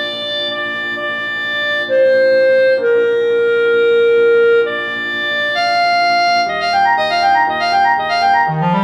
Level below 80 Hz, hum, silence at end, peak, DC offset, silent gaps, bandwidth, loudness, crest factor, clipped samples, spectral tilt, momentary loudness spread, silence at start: -56 dBFS; none; 0 s; -2 dBFS; under 0.1%; none; 10.5 kHz; -13 LUFS; 10 dB; under 0.1%; -4.5 dB/octave; 7 LU; 0 s